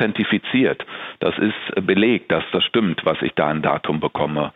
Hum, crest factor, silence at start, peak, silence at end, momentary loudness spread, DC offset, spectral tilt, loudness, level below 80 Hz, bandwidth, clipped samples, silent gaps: none; 16 dB; 0 s; -4 dBFS; 0.05 s; 6 LU; under 0.1%; -8.5 dB/octave; -20 LUFS; -56 dBFS; 4.3 kHz; under 0.1%; none